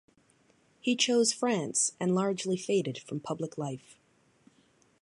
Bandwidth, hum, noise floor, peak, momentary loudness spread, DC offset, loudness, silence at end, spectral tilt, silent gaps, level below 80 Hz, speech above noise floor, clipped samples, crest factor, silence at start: 11.5 kHz; none; -67 dBFS; -10 dBFS; 12 LU; under 0.1%; -30 LUFS; 1.25 s; -3.5 dB/octave; none; -78 dBFS; 37 dB; under 0.1%; 22 dB; 0.85 s